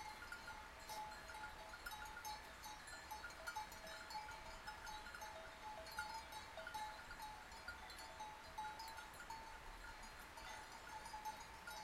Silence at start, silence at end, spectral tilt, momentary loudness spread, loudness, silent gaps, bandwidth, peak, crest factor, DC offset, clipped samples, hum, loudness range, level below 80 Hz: 0 s; 0 s; -2 dB/octave; 4 LU; -53 LUFS; none; 16 kHz; -34 dBFS; 20 dB; under 0.1%; under 0.1%; none; 2 LU; -66 dBFS